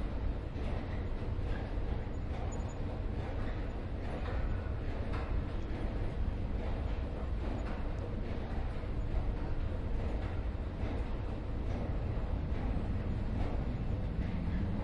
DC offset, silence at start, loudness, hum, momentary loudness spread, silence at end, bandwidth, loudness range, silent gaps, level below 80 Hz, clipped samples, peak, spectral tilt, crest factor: under 0.1%; 0 s; -39 LUFS; none; 3 LU; 0 s; 7.4 kHz; 2 LU; none; -38 dBFS; under 0.1%; -22 dBFS; -8 dB/octave; 14 dB